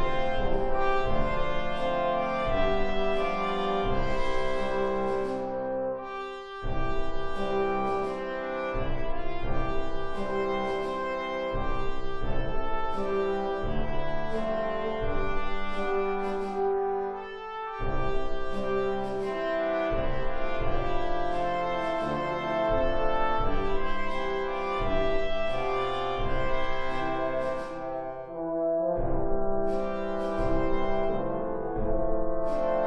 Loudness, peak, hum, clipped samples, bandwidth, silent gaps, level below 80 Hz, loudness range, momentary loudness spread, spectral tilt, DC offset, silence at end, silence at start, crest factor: -30 LUFS; -12 dBFS; none; under 0.1%; 6.2 kHz; none; -34 dBFS; 3 LU; 6 LU; -6.5 dB/octave; under 0.1%; 0 s; 0 s; 14 dB